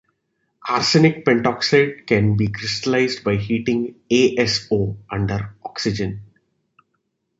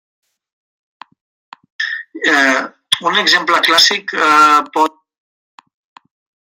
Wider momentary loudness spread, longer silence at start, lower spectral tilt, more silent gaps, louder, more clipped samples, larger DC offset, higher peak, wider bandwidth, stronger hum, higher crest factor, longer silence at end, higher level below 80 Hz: about the same, 10 LU vs 11 LU; second, 0.65 s vs 1.8 s; first, -5.5 dB/octave vs -1 dB/octave; neither; second, -19 LUFS vs -12 LUFS; neither; neither; about the same, -2 dBFS vs 0 dBFS; second, 8 kHz vs 16.5 kHz; neither; about the same, 18 dB vs 16 dB; second, 1.15 s vs 1.65 s; first, -46 dBFS vs -70 dBFS